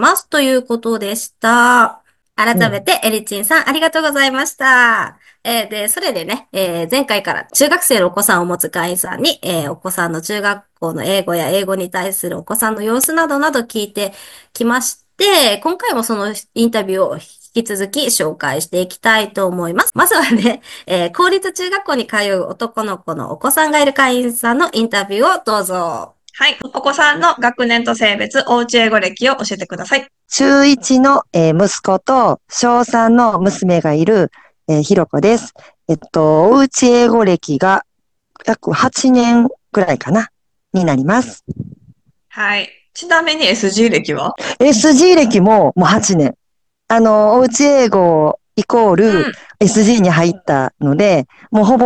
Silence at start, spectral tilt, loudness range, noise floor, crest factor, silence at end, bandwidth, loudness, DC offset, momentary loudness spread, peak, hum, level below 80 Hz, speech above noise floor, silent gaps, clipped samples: 0 s; -4 dB/octave; 5 LU; -67 dBFS; 14 dB; 0 s; 13 kHz; -13 LUFS; under 0.1%; 10 LU; 0 dBFS; none; -52 dBFS; 54 dB; none; under 0.1%